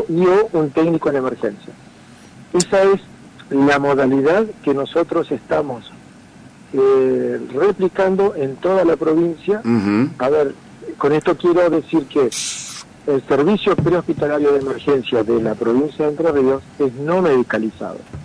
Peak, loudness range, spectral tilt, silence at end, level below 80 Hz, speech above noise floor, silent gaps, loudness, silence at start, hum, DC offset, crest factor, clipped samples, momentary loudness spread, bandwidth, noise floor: 0 dBFS; 2 LU; -5.5 dB/octave; 0 s; -52 dBFS; 26 dB; none; -17 LUFS; 0 s; none; under 0.1%; 16 dB; under 0.1%; 8 LU; 11 kHz; -42 dBFS